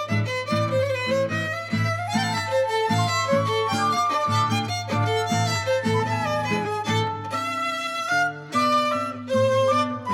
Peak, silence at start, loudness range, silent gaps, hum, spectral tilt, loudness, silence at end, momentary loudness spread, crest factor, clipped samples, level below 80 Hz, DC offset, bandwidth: -10 dBFS; 0 s; 2 LU; none; none; -5 dB/octave; -23 LUFS; 0 s; 4 LU; 14 dB; under 0.1%; -62 dBFS; under 0.1%; 15.5 kHz